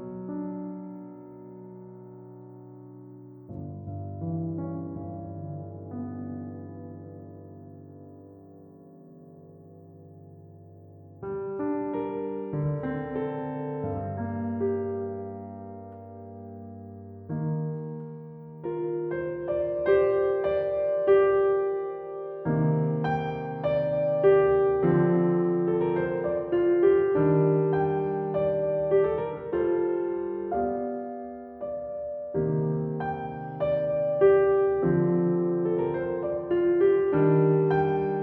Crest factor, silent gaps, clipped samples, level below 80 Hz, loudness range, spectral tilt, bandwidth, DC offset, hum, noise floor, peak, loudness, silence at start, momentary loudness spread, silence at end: 18 dB; none; under 0.1%; -58 dBFS; 16 LU; -11.5 dB/octave; 4.2 kHz; under 0.1%; none; -50 dBFS; -10 dBFS; -26 LUFS; 0 s; 22 LU; 0 s